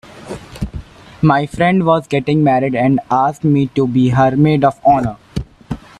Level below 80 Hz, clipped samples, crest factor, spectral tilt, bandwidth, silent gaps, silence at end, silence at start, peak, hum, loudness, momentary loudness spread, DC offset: -38 dBFS; under 0.1%; 14 dB; -8 dB/octave; 11.5 kHz; none; 0.25 s; 0.15 s; 0 dBFS; none; -14 LUFS; 16 LU; under 0.1%